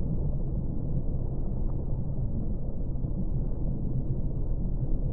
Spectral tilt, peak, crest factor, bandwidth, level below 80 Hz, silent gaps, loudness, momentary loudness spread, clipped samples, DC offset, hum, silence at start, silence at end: -16 dB/octave; -16 dBFS; 12 dB; 1.4 kHz; -30 dBFS; none; -33 LUFS; 2 LU; under 0.1%; under 0.1%; none; 0 s; 0 s